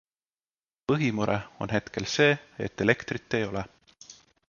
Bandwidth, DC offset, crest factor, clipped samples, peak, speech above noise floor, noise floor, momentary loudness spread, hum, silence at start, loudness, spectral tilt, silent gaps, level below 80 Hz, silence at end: 7.2 kHz; under 0.1%; 24 dB; under 0.1%; -6 dBFS; over 63 dB; under -90 dBFS; 13 LU; none; 0.9 s; -28 LUFS; -5 dB/octave; none; -56 dBFS; 0.35 s